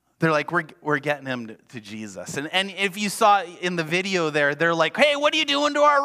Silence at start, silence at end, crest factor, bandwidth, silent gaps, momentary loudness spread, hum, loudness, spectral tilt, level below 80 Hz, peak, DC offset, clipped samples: 0.2 s; 0 s; 20 dB; 16 kHz; none; 15 LU; none; -22 LUFS; -4 dB/octave; -72 dBFS; -2 dBFS; under 0.1%; under 0.1%